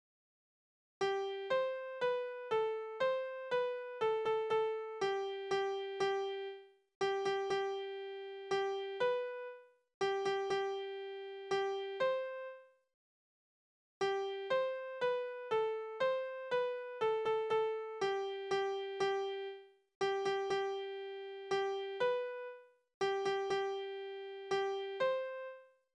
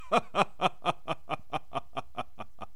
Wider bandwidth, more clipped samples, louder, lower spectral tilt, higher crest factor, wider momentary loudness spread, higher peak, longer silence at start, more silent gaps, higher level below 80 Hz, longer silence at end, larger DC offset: second, 9.8 kHz vs 14 kHz; neither; second, -38 LUFS vs -33 LUFS; about the same, -3.5 dB/octave vs -4.5 dB/octave; second, 14 dB vs 26 dB; second, 10 LU vs 13 LU; second, -24 dBFS vs -6 dBFS; first, 1 s vs 0 s; first, 6.95-7.01 s, 9.94-10.01 s, 12.94-14.01 s, 19.95-20.01 s, 22.94-23.01 s vs none; second, -82 dBFS vs -62 dBFS; first, 0.35 s vs 0.1 s; second, under 0.1% vs 1%